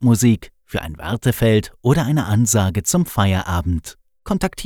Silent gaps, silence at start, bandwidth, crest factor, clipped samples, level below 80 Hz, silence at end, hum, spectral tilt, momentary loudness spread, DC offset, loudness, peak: none; 0 s; 19.5 kHz; 16 dB; under 0.1%; -38 dBFS; 0 s; none; -5.5 dB/octave; 10 LU; under 0.1%; -19 LUFS; -2 dBFS